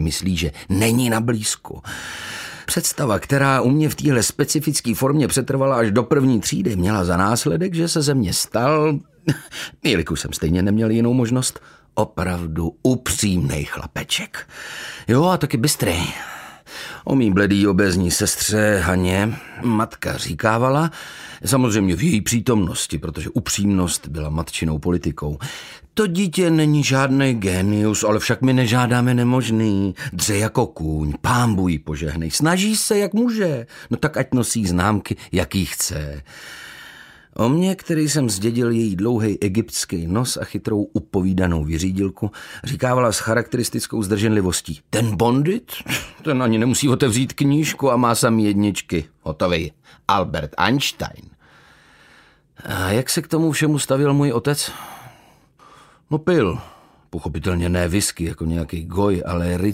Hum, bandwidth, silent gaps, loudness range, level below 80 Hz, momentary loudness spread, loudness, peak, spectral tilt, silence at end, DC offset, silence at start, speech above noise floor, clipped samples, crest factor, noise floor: none; 16 kHz; none; 4 LU; -40 dBFS; 11 LU; -20 LUFS; 0 dBFS; -5 dB/octave; 0 s; under 0.1%; 0 s; 33 dB; under 0.1%; 18 dB; -52 dBFS